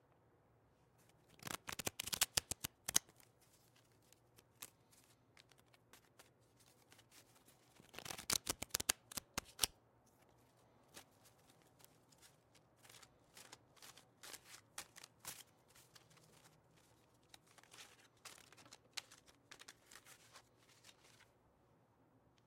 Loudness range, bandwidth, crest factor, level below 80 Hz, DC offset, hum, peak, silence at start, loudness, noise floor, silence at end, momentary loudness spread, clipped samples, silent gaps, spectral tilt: 22 LU; 16.5 kHz; 40 dB; -74 dBFS; under 0.1%; none; -12 dBFS; 1.45 s; -43 LUFS; -74 dBFS; 1.25 s; 28 LU; under 0.1%; none; -0.5 dB/octave